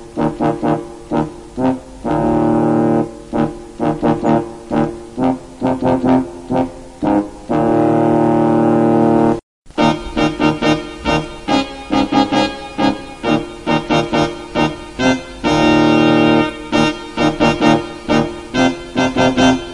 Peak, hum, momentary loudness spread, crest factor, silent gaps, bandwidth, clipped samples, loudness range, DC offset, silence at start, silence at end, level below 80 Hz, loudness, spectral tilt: 0 dBFS; none; 8 LU; 14 dB; 9.43-9.62 s; 11 kHz; under 0.1%; 3 LU; under 0.1%; 0 s; 0 s; -38 dBFS; -16 LUFS; -6 dB/octave